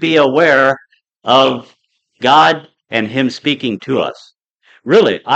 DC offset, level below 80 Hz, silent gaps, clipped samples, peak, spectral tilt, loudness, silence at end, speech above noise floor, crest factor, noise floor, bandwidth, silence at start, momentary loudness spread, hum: under 0.1%; -64 dBFS; 4.50-4.58 s; under 0.1%; 0 dBFS; -5 dB/octave; -13 LUFS; 0 s; 39 dB; 14 dB; -52 dBFS; 8.4 kHz; 0 s; 13 LU; none